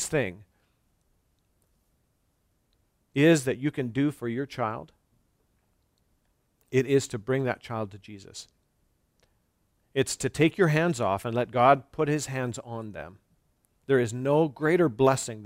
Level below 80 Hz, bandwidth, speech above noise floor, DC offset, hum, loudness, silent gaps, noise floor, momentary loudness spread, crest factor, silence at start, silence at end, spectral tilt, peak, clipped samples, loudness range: -62 dBFS; 16 kHz; 46 dB; under 0.1%; none; -26 LUFS; none; -72 dBFS; 17 LU; 22 dB; 0 s; 0 s; -5.5 dB/octave; -6 dBFS; under 0.1%; 7 LU